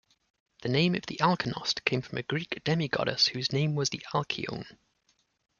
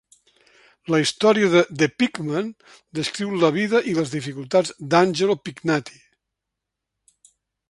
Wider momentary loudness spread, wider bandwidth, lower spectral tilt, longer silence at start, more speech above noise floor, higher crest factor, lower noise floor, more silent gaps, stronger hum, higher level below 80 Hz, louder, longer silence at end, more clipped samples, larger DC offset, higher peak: about the same, 8 LU vs 10 LU; second, 7.2 kHz vs 11.5 kHz; about the same, -4.5 dB/octave vs -5 dB/octave; second, 0.6 s vs 0.9 s; second, 43 dB vs 62 dB; first, 26 dB vs 20 dB; second, -72 dBFS vs -83 dBFS; neither; neither; about the same, -64 dBFS vs -64 dBFS; second, -29 LUFS vs -21 LUFS; second, 0.9 s vs 1.8 s; neither; neither; second, -6 dBFS vs -2 dBFS